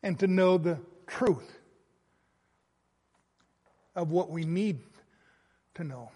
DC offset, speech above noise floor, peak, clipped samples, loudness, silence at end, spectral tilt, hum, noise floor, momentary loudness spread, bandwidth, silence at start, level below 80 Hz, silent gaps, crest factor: under 0.1%; 46 dB; -14 dBFS; under 0.1%; -29 LUFS; 0.05 s; -7.5 dB/octave; none; -75 dBFS; 17 LU; 11 kHz; 0.05 s; -70 dBFS; none; 18 dB